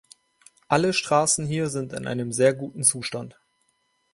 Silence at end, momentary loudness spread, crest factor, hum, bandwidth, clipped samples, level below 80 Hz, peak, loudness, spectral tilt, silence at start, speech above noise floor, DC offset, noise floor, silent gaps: 0.85 s; 11 LU; 22 dB; none; 12 kHz; under 0.1%; -62 dBFS; -4 dBFS; -23 LUFS; -3.5 dB/octave; 0.7 s; 47 dB; under 0.1%; -70 dBFS; none